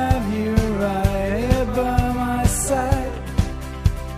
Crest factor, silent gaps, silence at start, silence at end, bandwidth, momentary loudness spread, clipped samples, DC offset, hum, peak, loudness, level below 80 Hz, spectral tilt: 18 dB; none; 0 s; 0 s; 15.5 kHz; 4 LU; under 0.1%; under 0.1%; none; -2 dBFS; -21 LUFS; -26 dBFS; -6 dB/octave